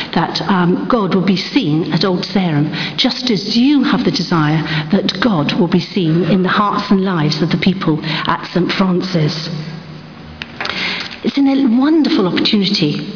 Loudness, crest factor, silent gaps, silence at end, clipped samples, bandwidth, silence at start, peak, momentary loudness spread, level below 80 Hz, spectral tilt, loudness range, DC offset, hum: -15 LUFS; 14 dB; none; 0 s; under 0.1%; 5.4 kHz; 0 s; 0 dBFS; 7 LU; -48 dBFS; -6.5 dB/octave; 3 LU; under 0.1%; none